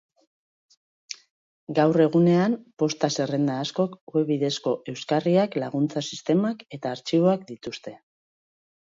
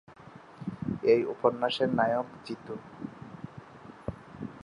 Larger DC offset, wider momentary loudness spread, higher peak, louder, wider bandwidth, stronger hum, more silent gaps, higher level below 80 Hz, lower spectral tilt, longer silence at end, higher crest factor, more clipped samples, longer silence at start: neither; second, 16 LU vs 22 LU; about the same, -8 dBFS vs -10 dBFS; first, -24 LUFS vs -29 LUFS; second, 7.8 kHz vs 10.5 kHz; neither; first, 1.30-1.67 s, 4.01-4.07 s vs none; second, -70 dBFS vs -60 dBFS; about the same, -6 dB/octave vs -7 dB/octave; first, 0.85 s vs 0 s; about the same, 18 dB vs 22 dB; neither; first, 1.1 s vs 0.1 s